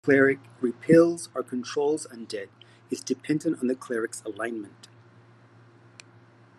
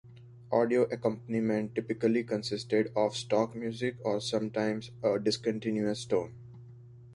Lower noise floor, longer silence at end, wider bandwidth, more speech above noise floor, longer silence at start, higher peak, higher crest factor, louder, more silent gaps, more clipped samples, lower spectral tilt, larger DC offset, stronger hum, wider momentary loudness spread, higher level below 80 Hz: first, -55 dBFS vs -51 dBFS; first, 1.9 s vs 0 s; about the same, 12.5 kHz vs 11.5 kHz; first, 29 dB vs 21 dB; about the same, 0.05 s vs 0.05 s; first, -6 dBFS vs -14 dBFS; about the same, 20 dB vs 18 dB; first, -26 LUFS vs -31 LUFS; neither; neither; about the same, -5.5 dB/octave vs -5.5 dB/octave; neither; neither; first, 17 LU vs 6 LU; second, -76 dBFS vs -68 dBFS